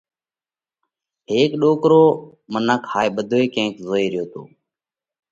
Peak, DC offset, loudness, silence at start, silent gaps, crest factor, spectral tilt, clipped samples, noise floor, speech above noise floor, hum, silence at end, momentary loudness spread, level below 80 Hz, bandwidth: -2 dBFS; under 0.1%; -18 LUFS; 1.3 s; none; 18 dB; -6 dB/octave; under 0.1%; under -90 dBFS; over 72 dB; none; 0.85 s; 14 LU; -64 dBFS; 7.6 kHz